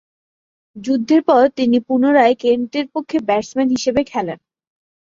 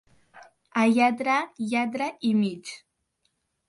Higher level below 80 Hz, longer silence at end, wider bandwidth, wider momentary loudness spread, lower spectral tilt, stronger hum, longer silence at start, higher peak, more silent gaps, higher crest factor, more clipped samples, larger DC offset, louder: first, -54 dBFS vs -74 dBFS; second, 0.7 s vs 0.9 s; second, 7.6 kHz vs 11.5 kHz; second, 10 LU vs 16 LU; about the same, -5 dB/octave vs -5.5 dB/octave; neither; first, 0.75 s vs 0.35 s; first, -2 dBFS vs -10 dBFS; neither; about the same, 16 dB vs 16 dB; neither; neither; first, -16 LUFS vs -25 LUFS